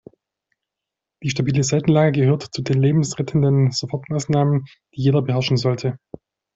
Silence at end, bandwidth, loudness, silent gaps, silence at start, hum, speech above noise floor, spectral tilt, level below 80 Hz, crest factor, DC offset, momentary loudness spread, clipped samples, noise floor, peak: 0.6 s; 8 kHz; -20 LUFS; none; 1.2 s; none; 66 dB; -6.5 dB/octave; -54 dBFS; 16 dB; under 0.1%; 9 LU; under 0.1%; -85 dBFS; -4 dBFS